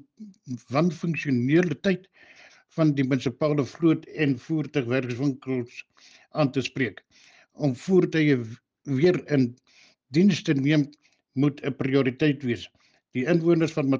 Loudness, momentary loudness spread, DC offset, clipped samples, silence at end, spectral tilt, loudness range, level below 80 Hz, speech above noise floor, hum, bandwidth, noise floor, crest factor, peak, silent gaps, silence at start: -25 LUFS; 11 LU; under 0.1%; under 0.1%; 0 s; -7 dB/octave; 3 LU; -66 dBFS; 29 dB; none; 7.6 kHz; -53 dBFS; 16 dB; -8 dBFS; none; 0.2 s